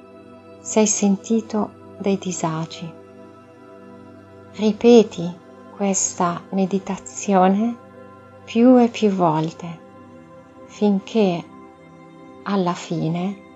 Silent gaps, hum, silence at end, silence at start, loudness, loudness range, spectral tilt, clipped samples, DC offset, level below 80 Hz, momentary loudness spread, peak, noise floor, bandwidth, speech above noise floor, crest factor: none; none; 0.2 s; 0.15 s; -20 LUFS; 6 LU; -5.5 dB/octave; under 0.1%; under 0.1%; -62 dBFS; 20 LU; 0 dBFS; -44 dBFS; 8.2 kHz; 25 dB; 20 dB